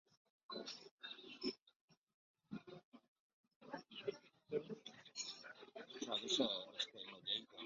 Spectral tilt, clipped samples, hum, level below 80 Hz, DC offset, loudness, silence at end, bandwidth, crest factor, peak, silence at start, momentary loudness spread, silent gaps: -1.5 dB/octave; under 0.1%; none; -88 dBFS; under 0.1%; -46 LUFS; 0 s; 7.4 kHz; 24 dB; -24 dBFS; 0.5 s; 17 LU; 0.91-0.98 s, 1.62-1.66 s, 1.76-1.88 s, 1.97-2.07 s, 2.14-2.34 s, 2.84-2.92 s, 3.08-3.44 s, 3.56-3.60 s